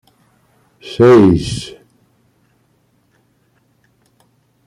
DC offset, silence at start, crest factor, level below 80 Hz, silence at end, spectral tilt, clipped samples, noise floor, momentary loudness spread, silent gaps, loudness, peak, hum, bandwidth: under 0.1%; 0.85 s; 16 dB; -44 dBFS; 2.95 s; -7 dB/octave; under 0.1%; -59 dBFS; 25 LU; none; -11 LUFS; -2 dBFS; none; 11 kHz